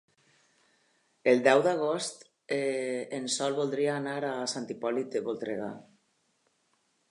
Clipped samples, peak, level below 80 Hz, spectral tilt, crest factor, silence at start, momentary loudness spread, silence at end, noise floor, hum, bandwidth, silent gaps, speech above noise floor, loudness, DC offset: under 0.1%; -8 dBFS; -84 dBFS; -4 dB/octave; 24 dB; 1.25 s; 12 LU; 1.3 s; -73 dBFS; none; 11.5 kHz; none; 44 dB; -30 LUFS; under 0.1%